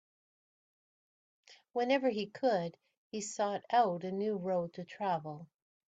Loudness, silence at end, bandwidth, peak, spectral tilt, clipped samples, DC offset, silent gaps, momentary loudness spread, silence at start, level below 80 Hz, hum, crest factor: -34 LUFS; 0.5 s; 9.2 kHz; -16 dBFS; -5 dB/octave; under 0.1%; under 0.1%; 2.97-3.11 s; 13 LU; 1.5 s; -82 dBFS; none; 20 dB